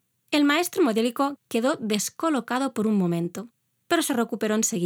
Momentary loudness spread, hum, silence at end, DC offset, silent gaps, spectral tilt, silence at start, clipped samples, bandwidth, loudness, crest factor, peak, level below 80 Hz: 5 LU; none; 0 s; under 0.1%; none; -4 dB/octave; 0.3 s; under 0.1%; 19.5 kHz; -24 LUFS; 18 dB; -6 dBFS; -78 dBFS